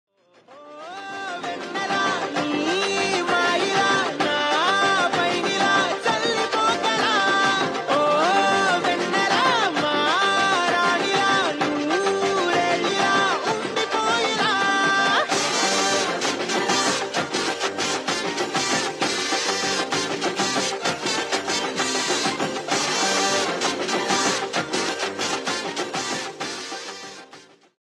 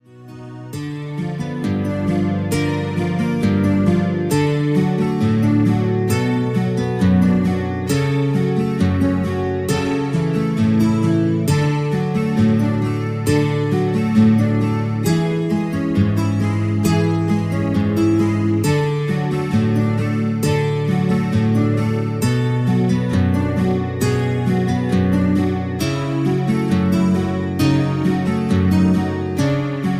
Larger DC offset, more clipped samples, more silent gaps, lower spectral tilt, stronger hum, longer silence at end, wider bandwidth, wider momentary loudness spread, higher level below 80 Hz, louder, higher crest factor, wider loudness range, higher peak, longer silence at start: neither; neither; neither; second, -2 dB/octave vs -7.5 dB/octave; neither; first, 0.4 s vs 0 s; second, 13.5 kHz vs 15.5 kHz; about the same, 7 LU vs 5 LU; second, -66 dBFS vs -44 dBFS; second, -21 LUFS vs -18 LUFS; about the same, 16 dB vs 14 dB; first, 4 LU vs 1 LU; second, -6 dBFS vs -2 dBFS; first, 0.5 s vs 0.15 s